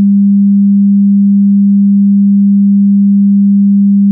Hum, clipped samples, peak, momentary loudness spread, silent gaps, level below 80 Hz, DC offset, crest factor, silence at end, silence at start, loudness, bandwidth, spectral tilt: none; under 0.1%; -4 dBFS; 0 LU; none; -66 dBFS; under 0.1%; 4 dB; 0 s; 0 s; -7 LUFS; 0.3 kHz; -23 dB/octave